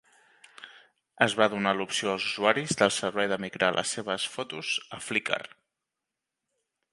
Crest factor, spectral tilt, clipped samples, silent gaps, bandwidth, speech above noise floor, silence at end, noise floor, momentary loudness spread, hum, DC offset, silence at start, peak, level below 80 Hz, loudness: 26 dB; -3 dB/octave; under 0.1%; none; 11.5 kHz; 59 dB; 1.45 s; -87 dBFS; 9 LU; none; under 0.1%; 0.6 s; -4 dBFS; -70 dBFS; -27 LUFS